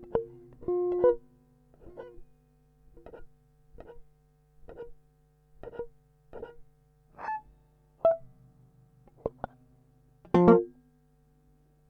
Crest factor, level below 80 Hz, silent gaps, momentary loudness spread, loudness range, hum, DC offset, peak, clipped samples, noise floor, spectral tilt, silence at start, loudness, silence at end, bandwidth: 28 dB; -56 dBFS; none; 28 LU; 25 LU; none; under 0.1%; -4 dBFS; under 0.1%; -65 dBFS; -10 dB/octave; 0.1 s; -28 LUFS; 1.2 s; 6.2 kHz